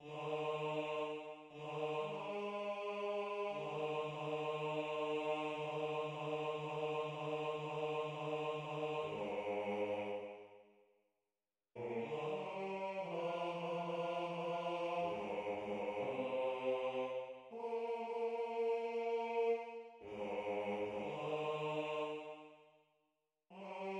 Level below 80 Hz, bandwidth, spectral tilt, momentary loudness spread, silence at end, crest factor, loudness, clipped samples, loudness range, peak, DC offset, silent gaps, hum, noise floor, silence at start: -82 dBFS; 10 kHz; -6 dB/octave; 8 LU; 0 s; 14 dB; -42 LUFS; under 0.1%; 4 LU; -28 dBFS; under 0.1%; none; none; under -90 dBFS; 0 s